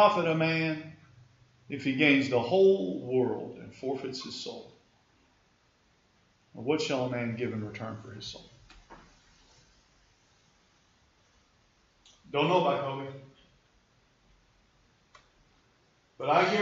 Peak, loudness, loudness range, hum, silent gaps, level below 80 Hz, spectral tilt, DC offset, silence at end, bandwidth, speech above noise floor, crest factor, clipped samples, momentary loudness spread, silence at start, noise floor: -8 dBFS; -29 LUFS; 15 LU; none; none; -70 dBFS; -6 dB/octave; under 0.1%; 0 s; 7.6 kHz; 39 dB; 24 dB; under 0.1%; 19 LU; 0 s; -68 dBFS